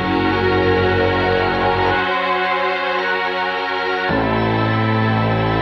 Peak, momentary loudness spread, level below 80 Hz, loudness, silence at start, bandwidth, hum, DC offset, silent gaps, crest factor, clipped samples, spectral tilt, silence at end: -4 dBFS; 3 LU; -38 dBFS; -17 LUFS; 0 s; 6.6 kHz; none; under 0.1%; none; 12 dB; under 0.1%; -7.5 dB/octave; 0 s